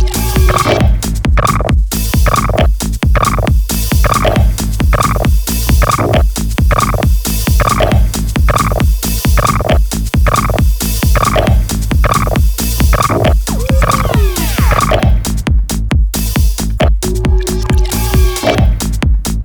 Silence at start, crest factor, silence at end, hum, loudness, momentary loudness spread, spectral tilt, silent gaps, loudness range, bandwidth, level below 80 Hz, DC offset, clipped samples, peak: 0 s; 10 dB; 0 s; none; -12 LUFS; 4 LU; -5 dB/octave; none; 1 LU; over 20 kHz; -12 dBFS; under 0.1%; under 0.1%; 0 dBFS